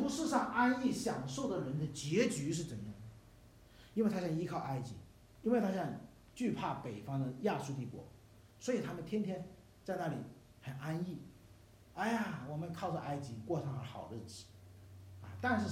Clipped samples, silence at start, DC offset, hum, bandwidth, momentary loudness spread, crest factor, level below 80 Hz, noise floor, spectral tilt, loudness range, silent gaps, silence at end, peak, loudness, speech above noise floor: under 0.1%; 0 s; under 0.1%; none; 16 kHz; 19 LU; 22 dB; -66 dBFS; -61 dBFS; -6 dB/octave; 5 LU; none; 0 s; -16 dBFS; -39 LUFS; 23 dB